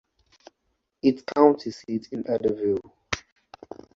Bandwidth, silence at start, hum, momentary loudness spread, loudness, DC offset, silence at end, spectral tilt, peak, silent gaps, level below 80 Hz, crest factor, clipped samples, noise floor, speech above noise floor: 7.6 kHz; 1.05 s; none; 13 LU; -25 LUFS; under 0.1%; 0.75 s; -6 dB/octave; -2 dBFS; none; -58 dBFS; 24 dB; under 0.1%; -76 dBFS; 52 dB